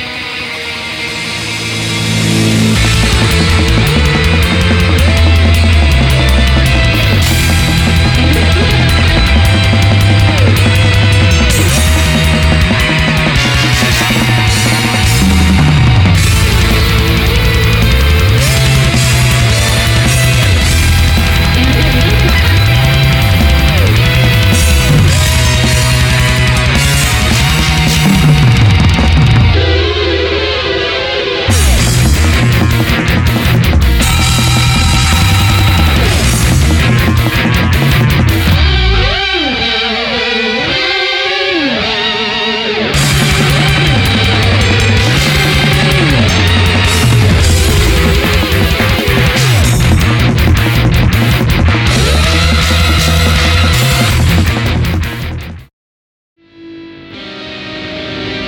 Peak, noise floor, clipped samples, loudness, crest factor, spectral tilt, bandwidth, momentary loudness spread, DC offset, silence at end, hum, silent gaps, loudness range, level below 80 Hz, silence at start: 0 dBFS; -31 dBFS; under 0.1%; -9 LUFS; 8 dB; -4.5 dB/octave; 19.5 kHz; 4 LU; under 0.1%; 0 s; none; 55.73-56.36 s; 2 LU; -16 dBFS; 0 s